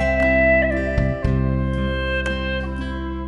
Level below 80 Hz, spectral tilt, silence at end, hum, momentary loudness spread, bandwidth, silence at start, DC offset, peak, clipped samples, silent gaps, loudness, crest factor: -26 dBFS; -7.5 dB/octave; 0 s; none; 10 LU; 8.2 kHz; 0 s; under 0.1%; -6 dBFS; under 0.1%; none; -20 LUFS; 14 dB